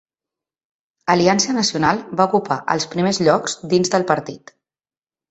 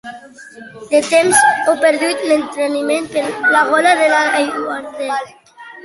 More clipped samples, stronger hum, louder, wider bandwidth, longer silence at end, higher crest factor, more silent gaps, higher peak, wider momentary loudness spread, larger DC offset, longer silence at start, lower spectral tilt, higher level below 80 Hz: neither; neither; second, -18 LUFS vs -14 LUFS; second, 8.2 kHz vs 12 kHz; first, 0.95 s vs 0.05 s; about the same, 18 dB vs 16 dB; neither; about the same, 0 dBFS vs 0 dBFS; second, 5 LU vs 12 LU; neither; first, 1.05 s vs 0.05 s; first, -4 dB/octave vs -2 dB/octave; first, -56 dBFS vs -62 dBFS